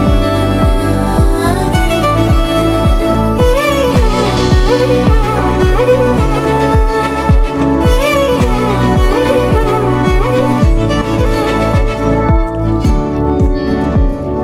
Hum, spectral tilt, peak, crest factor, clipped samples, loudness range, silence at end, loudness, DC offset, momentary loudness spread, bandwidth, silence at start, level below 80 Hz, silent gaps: none; -6.5 dB/octave; 0 dBFS; 10 dB; under 0.1%; 2 LU; 0 s; -12 LUFS; under 0.1%; 3 LU; 15.5 kHz; 0 s; -16 dBFS; none